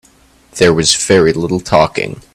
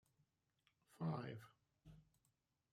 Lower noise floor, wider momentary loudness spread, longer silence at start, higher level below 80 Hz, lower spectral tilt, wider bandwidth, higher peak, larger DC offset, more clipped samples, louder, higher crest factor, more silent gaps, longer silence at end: second, -48 dBFS vs -86 dBFS; second, 9 LU vs 21 LU; second, 0.55 s vs 0.9 s; first, -40 dBFS vs -82 dBFS; second, -4 dB/octave vs -8 dB/octave; first, 17 kHz vs 13.5 kHz; first, 0 dBFS vs -32 dBFS; neither; neither; first, -12 LUFS vs -49 LUFS; second, 14 dB vs 22 dB; neither; second, 0.15 s vs 0.7 s